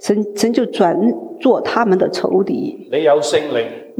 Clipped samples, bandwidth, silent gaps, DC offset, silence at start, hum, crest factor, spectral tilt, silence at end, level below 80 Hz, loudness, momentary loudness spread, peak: under 0.1%; 15.5 kHz; none; under 0.1%; 0 s; none; 14 dB; -5 dB/octave; 0.1 s; -62 dBFS; -16 LUFS; 6 LU; -2 dBFS